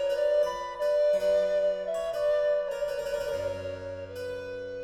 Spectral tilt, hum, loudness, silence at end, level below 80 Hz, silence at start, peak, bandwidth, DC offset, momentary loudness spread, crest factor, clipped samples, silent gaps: -4 dB/octave; none; -29 LUFS; 0 s; -58 dBFS; 0 s; -18 dBFS; 14 kHz; under 0.1%; 12 LU; 12 dB; under 0.1%; none